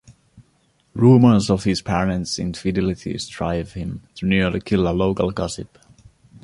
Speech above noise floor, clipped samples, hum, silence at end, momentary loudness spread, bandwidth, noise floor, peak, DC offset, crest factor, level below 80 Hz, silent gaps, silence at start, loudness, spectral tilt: 43 dB; under 0.1%; none; 0.75 s; 16 LU; 11.5 kHz; -62 dBFS; -2 dBFS; under 0.1%; 18 dB; -40 dBFS; none; 0.1 s; -20 LUFS; -6.5 dB/octave